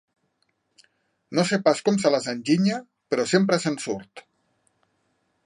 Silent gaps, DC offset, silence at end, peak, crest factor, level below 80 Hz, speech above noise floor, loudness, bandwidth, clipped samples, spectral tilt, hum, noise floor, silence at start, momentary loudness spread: none; under 0.1%; 1.25 s; -4 dBFS; 20 dB; -70 dBFS; 50 dB; -23 LUFS; 11 kHz; under 0.1%; -5 dB/octave; none; -72 dBFS; 1.3 s; 9 LU